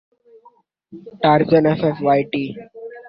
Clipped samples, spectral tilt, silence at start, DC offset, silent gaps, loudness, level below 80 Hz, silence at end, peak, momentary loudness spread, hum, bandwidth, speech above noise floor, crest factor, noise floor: under 0.1%; -10.5 dB/octave; 0.9 s; under 0.1%; none; -17 LUFS; -58 dBFS; 0.1 s; -2 dBFS; 17 LU; none; 5.6 kHz; 36 dB; 18 dB; -53 dBFS